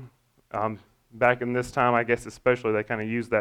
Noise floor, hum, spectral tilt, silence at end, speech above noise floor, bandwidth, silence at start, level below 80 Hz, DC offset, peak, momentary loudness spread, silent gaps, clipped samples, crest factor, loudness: -52 dBFS; none; -6.5 dB/octave; 0 s; 27 dB; 14 kHz; 0 s; -56 dBFS; under 0.1%; -6 dBFS; 8 LU; none; under 0.1%; 20 dB; -26 LUFS